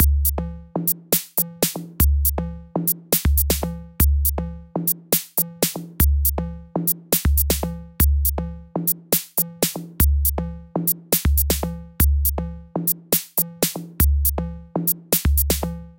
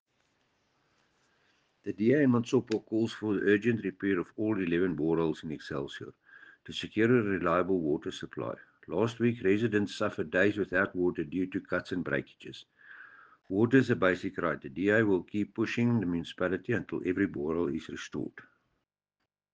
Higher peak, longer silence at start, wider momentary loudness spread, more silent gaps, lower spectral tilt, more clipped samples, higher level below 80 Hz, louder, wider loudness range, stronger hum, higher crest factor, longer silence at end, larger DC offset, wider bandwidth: first, -2 dBFS vs -10 dBFS; second, 0 s vs 1.85 s; second, 11 LU vs 14 LU; neither; second, -4.5 dB/octave vs -7 dB/octave; neither; first, -24 dBFS vs -64 dBFS; first, -21 LUFS vs -30 LUFS; about the same, 1 LU vs 3 LU; neither; about the same, 18 dB vs 20 dB; second, 0.05 s vs 1.1 s; neither; first, 17.5 kHz vs 8.8 kHz